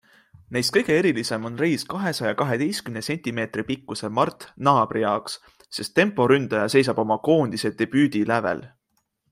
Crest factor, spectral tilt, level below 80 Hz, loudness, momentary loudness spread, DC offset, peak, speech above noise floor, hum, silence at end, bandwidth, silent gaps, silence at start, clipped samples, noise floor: 20 dB; -5 dB/octave; -62 dBFS; -23 LUFS; 9 LU; under 0.1%; -2 dBFS; 50 dB; none; 0.65 s; 16 kHz; none; 0.5 s; under 0.1%; -73 dBFS